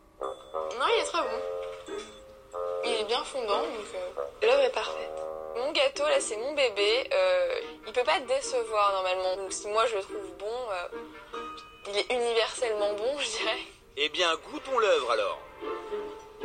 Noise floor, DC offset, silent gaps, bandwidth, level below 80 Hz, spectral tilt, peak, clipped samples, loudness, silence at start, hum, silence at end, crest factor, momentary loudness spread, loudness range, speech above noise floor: -49 dBFS; under 0.1%; none; 10.5 kHz; -62 dBFS; -1 dB/octave; -12 dBFS; under 0.1%; -29 LUFS; 0.2 s; none; 0 s; 18 dB; 14 LU; 5 LU; 20 dB